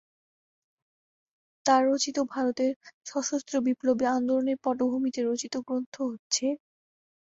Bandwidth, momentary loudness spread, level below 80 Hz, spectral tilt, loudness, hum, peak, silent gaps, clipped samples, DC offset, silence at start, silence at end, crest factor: 8 kHz; 9 LU; -74 dBFS; -2.5 dB/octave; -28 LUFS; none; -10 dBFS; 2.76-2.81 s, 2.94-3.01 s, 5.86-5.92 s, 6.19-6.30 s; under 0.1%; under 0.1%; 1.65 s; 0.65 s; 20 dB